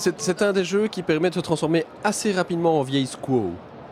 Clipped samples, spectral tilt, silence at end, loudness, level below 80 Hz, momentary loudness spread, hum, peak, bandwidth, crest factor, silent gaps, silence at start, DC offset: under 0.1%; -5 dB/octave; 0 s; -23 LUFS; -60 dBFS; 4 LU; none; -6 dBFS; 15.5 kHz; 16 dB; none; 0 s; under 0.1%